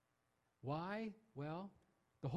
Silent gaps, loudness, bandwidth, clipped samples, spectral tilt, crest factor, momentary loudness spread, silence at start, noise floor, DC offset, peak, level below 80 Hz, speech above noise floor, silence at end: none; -48 LUFS; 10.5 kHz; under 0.1%; -8.5 dB/octave; 20 dB; 8 LU; 0.65 s; -84 dBFS; under 0.1%; -28 dBFS; -78 dBFS; 37 dB; 0 s